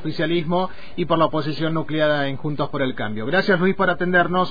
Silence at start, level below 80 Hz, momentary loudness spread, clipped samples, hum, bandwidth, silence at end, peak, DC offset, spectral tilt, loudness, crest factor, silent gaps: 0 s; -50 dBFS; 7 LU; under 0.1%; none; 5 kHz; 0 s; -6 dBFS; 4%; -8 dB/octave; -21 LUFS; 16 dB; none